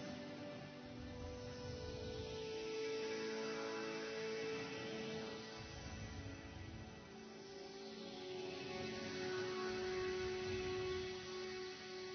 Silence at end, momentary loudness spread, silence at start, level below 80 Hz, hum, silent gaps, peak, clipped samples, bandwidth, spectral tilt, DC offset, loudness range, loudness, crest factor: 0 s; 10 LU; 0 s; -62 dBFS; none; none; -32 dBFS; under 0.1%; 6.4 kHz; -3.5 dB/octave; under 0.1%; 6 LU; -46 LUFS; 14 dB